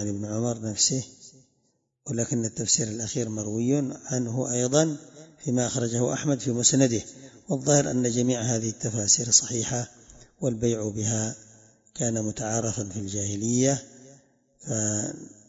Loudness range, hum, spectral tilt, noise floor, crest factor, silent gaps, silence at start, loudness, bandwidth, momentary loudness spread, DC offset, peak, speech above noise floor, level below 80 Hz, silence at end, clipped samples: 5 LU; none; -4 dB/octave; -72 dBFS; 22 dB; none; 0 s; -25 LUFS; 8 kHz; 11 LU; under 0.1%; -4 dBFS; 46 dB; -60 dBFS; 0.2 s; under 0.1%